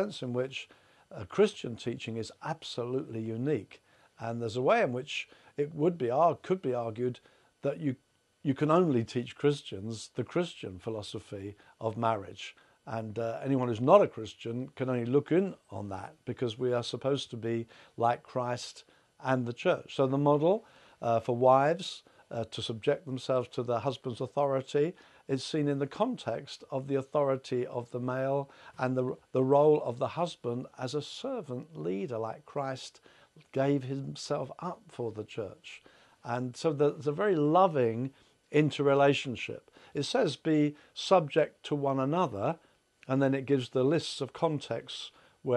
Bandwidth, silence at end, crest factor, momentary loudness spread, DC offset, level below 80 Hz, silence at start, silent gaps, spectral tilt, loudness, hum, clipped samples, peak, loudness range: 11.5 kHz; 0 s; 24 dB; 15 LU; under 0.1%; -76 dBFS; 0 s; none; -6.5 dB/octave; -31 LUFS; none; under 0.1%; -8 dBFS; 7 LU